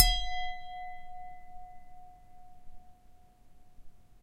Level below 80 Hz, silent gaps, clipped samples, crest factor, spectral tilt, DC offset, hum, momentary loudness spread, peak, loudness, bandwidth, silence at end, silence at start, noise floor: -42 dBFS; none; under 0.1%; 30 dB; -1 dB/octave; under 0.1%; none; 25 LU; -4 dBFS; -35 LUFS; 16 kHz; 0.05 s; 0 s; -56 dBFS